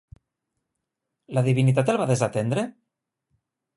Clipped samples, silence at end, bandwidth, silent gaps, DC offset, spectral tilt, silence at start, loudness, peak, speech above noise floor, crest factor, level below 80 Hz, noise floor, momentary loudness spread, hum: under 0.1%; 1.05 s; 11.5 kHz; none; under 0.1%; -7 dB/octave; 1.3 s; -23 LUFS; -6 dBFS; 61 dB; 20 dB; -62 dBFS; -83 dBFS; 8 LU; none